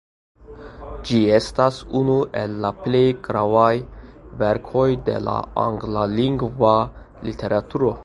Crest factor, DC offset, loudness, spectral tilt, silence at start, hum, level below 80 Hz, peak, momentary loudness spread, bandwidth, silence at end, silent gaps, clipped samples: 18 dB; under 0.1%; -20 LUFS; -7.5 dB/octave; 0.5 s; none; -42 dBFS; -2 dBFS; 14 LU; 11.5 kHz; 0 s; none; under 0.1%